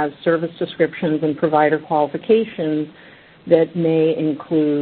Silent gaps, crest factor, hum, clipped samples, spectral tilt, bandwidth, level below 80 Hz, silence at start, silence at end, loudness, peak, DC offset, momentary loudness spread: none; 18 dB; none; under 0.1%; -12 dB/octave; 4.5 kHz; -62 dBFS; 0 s; 0 s; -19 LUFS; 0 dBFS; under 0.1%; 6 LU